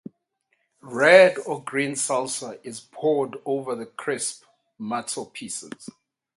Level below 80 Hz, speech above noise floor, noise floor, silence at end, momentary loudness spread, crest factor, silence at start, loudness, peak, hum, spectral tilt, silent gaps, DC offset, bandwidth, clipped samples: -74 dBFS; 50 dB; -73 dBFS; 0.5 s; 23 LU; 24 dB; 0.85 s; -23 LUFS; -2 dBFS; none; -3 dB/octave; none; under 0.1%; 11.5 kHz; under 0.1%